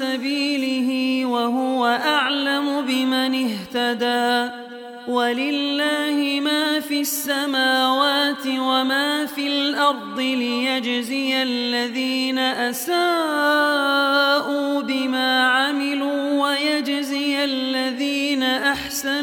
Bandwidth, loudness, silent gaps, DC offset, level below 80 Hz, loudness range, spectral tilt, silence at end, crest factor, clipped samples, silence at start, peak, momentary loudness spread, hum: 18 kHz; -20 LUFS; none; under 0.1%; -64 dBFS; 3 LU; -2 dB/octave; 0 s; 16 dB; under 0.1%; 0 s; -4 dBFS; 5 LU; none